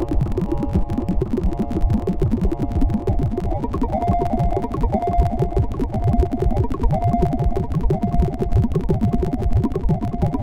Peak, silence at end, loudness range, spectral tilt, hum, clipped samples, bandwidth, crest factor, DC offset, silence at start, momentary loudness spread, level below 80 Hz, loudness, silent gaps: -4 dBFS; 0 s; 1 LU; -10 dB/octave; none; under 0.1%; 10 kHz; 14 dB; under 0.1%; 0 s; 3 LU; -24 dBFS; -21 LUFS; none